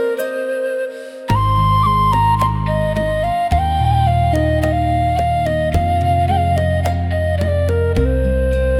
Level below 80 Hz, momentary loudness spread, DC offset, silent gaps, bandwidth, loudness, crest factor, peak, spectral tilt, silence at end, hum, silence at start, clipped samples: -26 dBFS; 6 LU; under 0.1%; none; 14.5 kHz; -17 LUFS; 12 dB; -4 dBFS; -7.5 dB/octave; 0 s; none; 0 s; under 0.1%